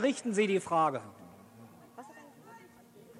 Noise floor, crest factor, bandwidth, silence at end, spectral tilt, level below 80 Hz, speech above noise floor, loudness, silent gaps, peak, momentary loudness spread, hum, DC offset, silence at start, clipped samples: -56 dBFS; 18 dB; 15.5 kHz; 0 s; -5 dB/octave; -80 dBFS; 26 dB; -30 LUFS; none; -16 dBFS; 25 LU; none; under 0.1%; 0 s; under 0.1%